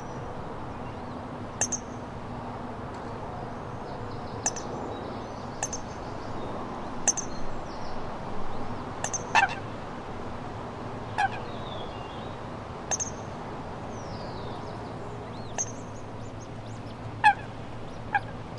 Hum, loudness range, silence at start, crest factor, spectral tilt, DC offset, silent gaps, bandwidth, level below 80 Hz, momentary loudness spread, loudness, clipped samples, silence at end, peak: none; 5 LU; 0 s; 26 dB; -3.5 dB/octave; under 0.1%; none; 11.5 kHz; -46 dBFS; 12 LU; -33 LUFS; under 0.1%; 0 s; -8 dBFS